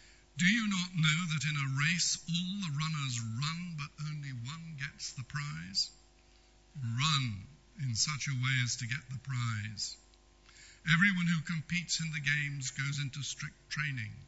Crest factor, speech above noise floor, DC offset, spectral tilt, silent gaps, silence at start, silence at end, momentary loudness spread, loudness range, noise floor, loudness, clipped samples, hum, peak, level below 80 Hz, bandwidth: 22 dB; 28 dB; under 0.1%; -3 dB/octave; none; 0.05 s; 0 s; 13 LU; 6 LU; -63 dBFS; -34 LUFS; under 0.1%; none; -14 dBFS; -64 dBFS; 8.2 kHz